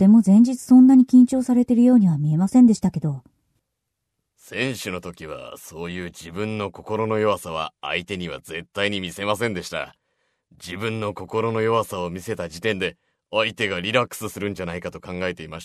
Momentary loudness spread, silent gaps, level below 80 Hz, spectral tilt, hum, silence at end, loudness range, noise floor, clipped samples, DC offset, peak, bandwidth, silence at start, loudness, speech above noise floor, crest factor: 18 LU; none; -56 dBFS; -6 dB/octave; none; 0 s; 13 LU; -79 dBFS; under 0.1%; under 0.1%; -4 dBFS; 13.5 kHz; 0 s; -20 LUFS; 59 dB; 18 dB